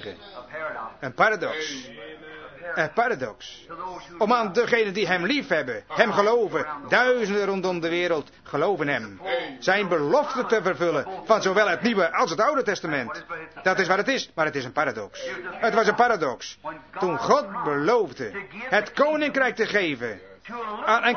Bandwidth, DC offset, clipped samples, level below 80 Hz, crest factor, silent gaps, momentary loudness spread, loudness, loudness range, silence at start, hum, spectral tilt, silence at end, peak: 6.6 kHz; under 0.1%; under 0.1%; -64 dBFS; 22 dB; none; 14 LU; -24 LUFS; 4 LU; 0 s; none; -4.5 dB/octave; 0 s; -2 dBFS